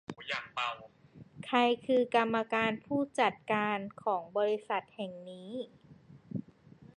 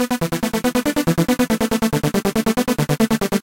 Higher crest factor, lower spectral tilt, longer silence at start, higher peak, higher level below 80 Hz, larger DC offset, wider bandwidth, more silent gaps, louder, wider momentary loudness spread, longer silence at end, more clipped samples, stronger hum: about the same, 18 dB vs 14 dB; about the same, -5.5 dB/octave vs -5 dB/octave; about the same, 0.1 s vs 0 s; second, -14 dBFS vs -4 dBFS; second, -74 dBFS vs -40 dBFS; second, under 0.1% vs 0.4%; second, 11 kHz vs 17 kHz; neither; second, -33 LUFS vs -19 LUFS; first, 15 LU vs 2 LU; about the same, 0.1 s vs 0 s; neither; neither